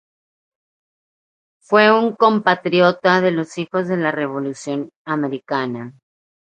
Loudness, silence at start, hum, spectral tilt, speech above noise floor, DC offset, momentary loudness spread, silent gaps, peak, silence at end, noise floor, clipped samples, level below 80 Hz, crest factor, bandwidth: -18 LUFS; 1.7 s; none; -6 dB/octave; over 72 dB; under 0.1%; 12 LU; 4.96-5.05 s; 0 dBFS; 0.6 s; under -90 dBFS; under 0.1%; -70 dBFS; 20 dB; 9.6 kHz